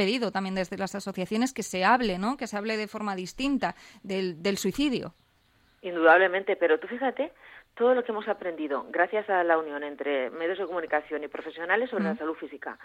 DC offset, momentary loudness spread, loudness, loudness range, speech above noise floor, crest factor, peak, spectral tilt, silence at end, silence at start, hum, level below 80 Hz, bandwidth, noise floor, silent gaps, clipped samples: under 0.1%; 11 LU; -28 LUFS; 5 LU; 37 dB; 20 dB; -8 dBFS; -4.5 dB/octave; 0 s; 0 s; none; -58 dBFS; 16.5 kHz; -65 dBFS; none; under 0.1%